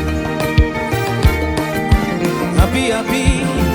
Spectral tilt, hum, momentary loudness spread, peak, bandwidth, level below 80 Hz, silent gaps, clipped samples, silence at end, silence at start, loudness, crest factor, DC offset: -5.5 dB/octave; none; 4 LU; 0 dBFS; over 20 kHz; -22 dBFS; none; under 0.1%; 0 s; 0 s; -16 LUFS; 14 dB; under 0.1%